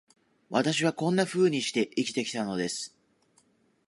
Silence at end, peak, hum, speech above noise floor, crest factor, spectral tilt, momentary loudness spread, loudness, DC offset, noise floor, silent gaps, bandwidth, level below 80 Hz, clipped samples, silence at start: 1 s; -10 dBFS; none; 39 dB; 20 dB; -4.5 dB/octave; 7 LU; -28 LUFS; under 0.1%; -67 dBFS; none; 11.5 kHz; -74 dBFS; under 0.1%; 0.5 s